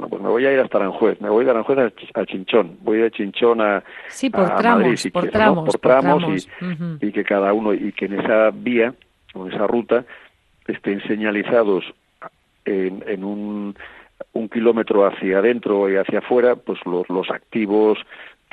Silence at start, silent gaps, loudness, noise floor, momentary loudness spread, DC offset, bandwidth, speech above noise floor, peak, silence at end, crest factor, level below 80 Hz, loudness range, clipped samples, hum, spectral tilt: 0 s; none; -19 LUFS; -42 dBFS; 11 LU; under 0.1%; 12 kHz; 24 dB; 0 dBFS; 0.25 s; 18 dB; -58 dBFS; 5 LU; under 0.1%; none; -6.5 dB/octave